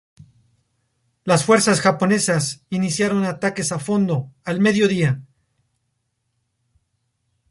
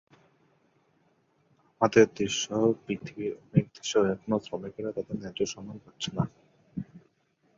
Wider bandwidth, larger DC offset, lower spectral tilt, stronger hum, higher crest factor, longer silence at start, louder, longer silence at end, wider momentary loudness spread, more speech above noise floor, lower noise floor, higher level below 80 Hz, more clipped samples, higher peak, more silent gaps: first, 11.5 kHz vs 7.8 kHz; neither; about the same, -5 dB/octave vs -5 dB/octave; neither; second, 18 dB vs 24 dB; second, 1.25 s vs 1.8 s; first, -19 LUFS vs -29 LUFS; first, 2.25 s vs 0.6 s; second, 9 LU vs 18 LU; first, 54 dB vs 42 dB; about the same, -73 dBFS vs -70 dBFS; about the same, -60 dBFS vs -62 dBFS; neither; first, -2 dBFS vs -6 dBFS; neither